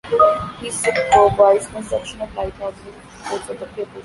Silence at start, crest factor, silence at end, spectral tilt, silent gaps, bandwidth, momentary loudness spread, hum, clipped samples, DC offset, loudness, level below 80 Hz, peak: 0.05 s; 16 dB; 0.05 s; -4 dB/octave; none; 11.5 kHz; 17 LU; none; under 0.1%; under 0.1%; -18 LUFS; -44 dBFS; -2 dBFS